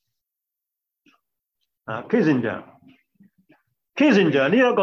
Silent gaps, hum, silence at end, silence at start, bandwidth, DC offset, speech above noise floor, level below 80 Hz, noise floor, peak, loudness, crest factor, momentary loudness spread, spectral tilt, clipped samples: none; none; 0 s; 1.9 s; 7.2 kHz; under 0.1%; 66 dB; -68 dBFS; -85 dBFS; -6 dBFS; -19 LUFS; 18 dB; 18 LU; -7 dB/octave; under 0.1%